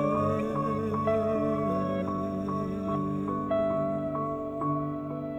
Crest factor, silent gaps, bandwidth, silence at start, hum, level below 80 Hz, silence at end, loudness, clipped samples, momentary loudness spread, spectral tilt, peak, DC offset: 14 dB; none; 12.5 kHz; 0 s; none; -54 dBFS; 0 s; -30 LUFS; under 0.1%; 5 LU; -9 dB/octave; -16 dBFS; under 0.1%